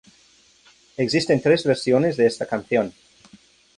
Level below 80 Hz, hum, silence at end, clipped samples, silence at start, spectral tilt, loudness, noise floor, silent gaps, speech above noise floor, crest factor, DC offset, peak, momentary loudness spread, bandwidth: -60 dBFS; none; 0.85 s; under 0.1%; 1 s; -5.5 dB/octave; -21 LUFS; -56 dBFS; none; 36 dB; 18 dB; under 0.1%; -4 dBFS; 9 LU; 11 kHz